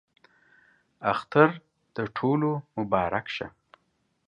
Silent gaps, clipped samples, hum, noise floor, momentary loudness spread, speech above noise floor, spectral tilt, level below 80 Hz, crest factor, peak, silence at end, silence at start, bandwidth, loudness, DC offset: none; under 0.1%; none; -73 dBFS; 15 LU; 47 dB; -8 dB/octave; -60 dBFS; 26 dB; -2 dBFS; 0.8 s; 1 s; 9.2 kHz; -26 LUFS; under 0.1%